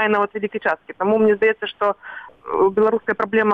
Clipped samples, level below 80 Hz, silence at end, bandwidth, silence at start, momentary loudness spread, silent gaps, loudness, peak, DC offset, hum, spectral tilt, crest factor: under 0.1%; -60 dBFS; 0 s; 4.6 kHz; 0 s; 10 LU; none; -19 LUFS; -6 dBFS; under 0.1%; none; -7.5 dB/octave; 12 dB